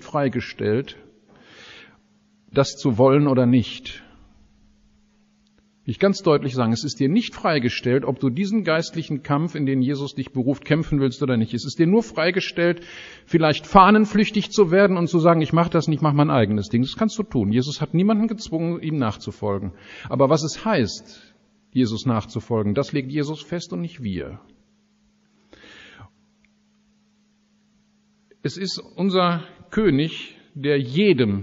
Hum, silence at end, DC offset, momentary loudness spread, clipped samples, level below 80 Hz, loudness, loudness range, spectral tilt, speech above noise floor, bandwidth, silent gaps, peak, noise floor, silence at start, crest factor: none; 0 s; under 0.1%; 12 LU; under 0.1%; -50 dBFS; -21 LUFS; 10 LU; -5.5 dB/octave; 42 dB; 7.8 kHz; none; 0 dBFS; -62 dBFS; 0 s; 22 dB